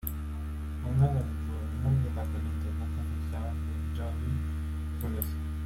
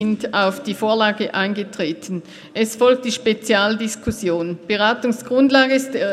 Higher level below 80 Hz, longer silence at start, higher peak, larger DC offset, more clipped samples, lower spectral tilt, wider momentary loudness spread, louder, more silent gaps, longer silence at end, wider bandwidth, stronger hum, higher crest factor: first, -36 dBFS vs -50 dBFS; about the same, 0 s vs 0 s; second, -14 dBFS vs 0 dBFS; neither; neither; first, -8 dB/octave vs -4 dB/octave; about the same, 8 LU vs 9 LU; second, -33 LUFS vs -19 LUFS; neither; about the same, 0 s vs 0 s; about the same, 16.5 kHz vs 15 kHz; neither; about the same, 18 dB vs 18 dB